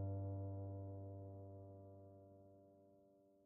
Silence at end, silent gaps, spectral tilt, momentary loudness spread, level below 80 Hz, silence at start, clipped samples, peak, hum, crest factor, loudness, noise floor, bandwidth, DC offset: 0 s; none; -13.5 dB/octave; 20 LU; -80 dBFS; 0 s; under 0.1%; -38 dBFS; none; 14 dB; -52 LUFS; -72 dBFS; 1.5 kHz; under 0.1%